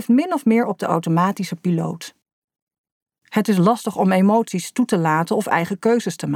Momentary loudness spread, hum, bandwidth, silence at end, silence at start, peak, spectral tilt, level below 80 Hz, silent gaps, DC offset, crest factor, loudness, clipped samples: 7 LU; none; 16 kHz; 0 s; 0 s; -4 dBFS; -6.5 dB/octave; -70 dBFS; 2.33-2.48 s, 2.62-2.67 s, 2.78-2.84 s, 2.92-3.06 s; under 0.1%; 16 dB; -19 LUFS; under 0.1%